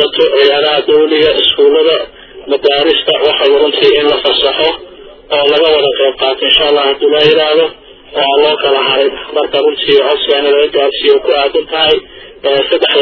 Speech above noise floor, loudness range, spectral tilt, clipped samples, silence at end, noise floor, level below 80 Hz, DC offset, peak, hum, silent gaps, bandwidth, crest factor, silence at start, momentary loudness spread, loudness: 23 dB; 1 LU; -5 dB/octave; 0.2%; 0 s; -33 dBFS; -44 dBFS; under 0.1%; 0 dBFS; none; none; 6 kHz; 10 dB; 0 s; 6 LU; -9 LUFS